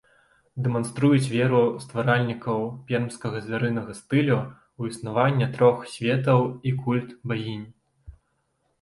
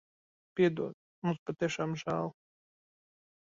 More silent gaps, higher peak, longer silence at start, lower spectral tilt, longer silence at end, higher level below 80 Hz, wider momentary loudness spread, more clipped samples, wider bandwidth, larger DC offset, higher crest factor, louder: second, none vs 0.94-1.22 s, 1.39-1.46 s; first, -6 dBFS vs -16 dBFS; about the same, 0.55 s vs 0.55 s; about the same, -7 dB/octave vs -6.5 dB/octave; second, 0.7 s vs 1.1 s; first, -58 dBFS vs -72 dBFS; about the same, 11 LU vs 11 LU; neither; first, 11.5 kHz vs 7.6 kHz; neither; about the same, 20 dB vs 20 dB; first, -24 LUFS vs -34 LUFS